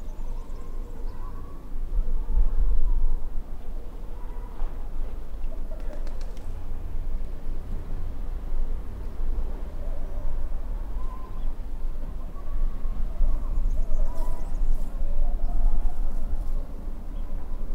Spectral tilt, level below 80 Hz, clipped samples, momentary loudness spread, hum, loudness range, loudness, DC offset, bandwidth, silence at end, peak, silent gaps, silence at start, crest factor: -8 dB/octave; -24 dBFS; under 0.1%; 10 LU; none; 6 LU; -35 LUFS; under 0.1%; 2.1 kHz; 0 s; -8 dBFS; none; 0 s; 14 dB